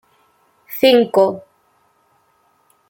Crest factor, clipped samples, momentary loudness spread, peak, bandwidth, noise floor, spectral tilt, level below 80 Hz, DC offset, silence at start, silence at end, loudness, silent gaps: 18 dB; under 0.1%; 19 LU; -2 dBFS; 17 kHz; -60 dBFS; -5 dB/octave; -66 dBFS; under 0.1%; 0.7 s; 1.5 s; -14 LUFS; none